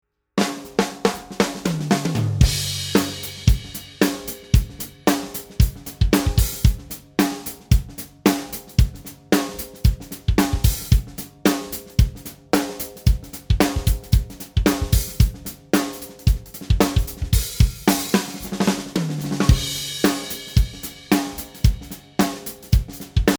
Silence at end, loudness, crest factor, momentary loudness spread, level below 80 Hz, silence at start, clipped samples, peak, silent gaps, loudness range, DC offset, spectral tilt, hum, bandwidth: 0 s; -22 LUFS; 20 dB; 8 LU; -26 dBFS; 0.35 s; under 0.1%; 0 dBFS; none; 1 LU; under 0.1%; -5 dB/octave; none; over 20 kHz